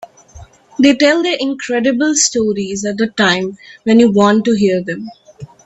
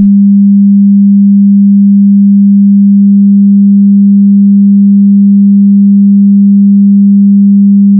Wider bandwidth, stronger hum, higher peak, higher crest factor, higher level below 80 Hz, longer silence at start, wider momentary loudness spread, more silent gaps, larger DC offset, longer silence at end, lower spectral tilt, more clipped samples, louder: first, 8.4 kHz vs 0.4 kHz; neither; about the same, 0 dBFS vs 0 dBFS; first, 14 dB vs 4 dB; first, -52 dBFS vs -64 dBFS; about the same, 0 s vs 0 s; first, 13 LU vs 0 LU; neither; neither; first, 0.2 s vs 0 s; second, -3.5 dB/octave vs -26.5 dB/octave; neither; second, -13 LUFS vs -4 LUFS